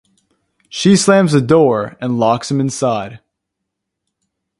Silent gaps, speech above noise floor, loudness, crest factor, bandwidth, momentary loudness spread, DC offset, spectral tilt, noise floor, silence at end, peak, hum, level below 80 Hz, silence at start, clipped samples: none; 64 dB; -14 LUFS; 16 dB; 11.5 kHz; 11 LU; under 0.1%; -5.5 dB/octave; -77 dBFS; 1.4 s; 0 dBFS; none; -54 dBFS; 0.75 s; under 0.1%